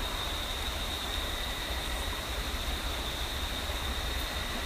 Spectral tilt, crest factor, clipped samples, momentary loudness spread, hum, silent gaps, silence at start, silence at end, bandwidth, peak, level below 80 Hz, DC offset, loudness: -3 dB/octave; 14 dB; under 0.1%; 1 LU; none; none; 0 s; 0 s; 15.5 kHz; -20 dBFS; -38 dBFS; under 0.1%; -33 LUFS